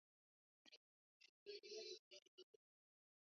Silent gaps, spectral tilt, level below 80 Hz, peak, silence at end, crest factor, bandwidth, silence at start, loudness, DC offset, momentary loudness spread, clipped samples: 0.77-1.20 s, 1.29-1.46 s, 1.99-2.11 s, 2.28-2.38 s; 1 dB/octave; under -90 dBFS; -44 dBFS; 0.9 s; 20 dB; 7.2 kHz; 0.65 s; -58 LUFS; under 0.1%; 15 LU; under 0.1%